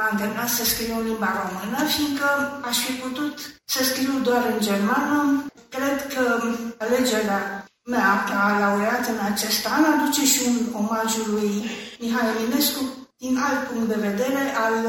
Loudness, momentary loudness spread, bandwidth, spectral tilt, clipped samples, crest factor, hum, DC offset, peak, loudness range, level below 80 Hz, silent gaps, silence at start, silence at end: -22 LUFS; 8 LU; 17 kHz; -3 dB/octave; under 0.1%; 18 dB; none; under 0.1%; -4 dBFS; 3 LU; -56 dBFS; none; 0 s; 0 s